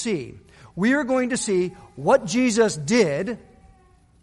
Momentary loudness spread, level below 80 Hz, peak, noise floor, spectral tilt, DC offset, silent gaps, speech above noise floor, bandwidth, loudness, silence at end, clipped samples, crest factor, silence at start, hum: 12 LU; -56 dBFS; -4 dBFS; -55 dBFS; -4.5 dB/octave; under 0.1%; none; 33 dB; 11.5 kHz; -22 LUFS; 0.85 s; under 0.1%; 18 dB; 0 s; none